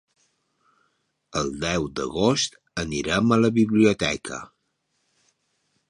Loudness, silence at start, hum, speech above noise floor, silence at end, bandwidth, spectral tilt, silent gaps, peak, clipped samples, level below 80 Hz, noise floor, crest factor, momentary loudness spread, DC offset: -23 LUFS; 1.35 s; none; 51 dB; 1.45 s; 10.5 kHz; -4.5 dB/octave; none; -6 dBFS; under 0.1%; -50 dBFS; -74 dBFS; 20 dB; 12 LU; under 0.1%